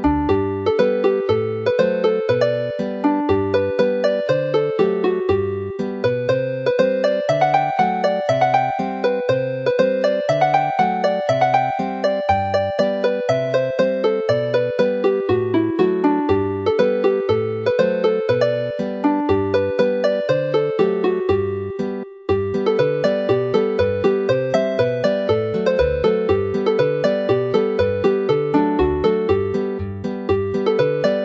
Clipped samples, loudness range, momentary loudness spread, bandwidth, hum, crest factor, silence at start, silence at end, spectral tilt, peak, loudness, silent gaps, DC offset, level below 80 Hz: under 0.1%; 1 LU; 4 LU; 7.8 kHz; none; 16 dB; 0 s; 0 s; -7 dB/octave; -2 dBFS; -19 LUFS; none; under 0.1%; -44 dBFS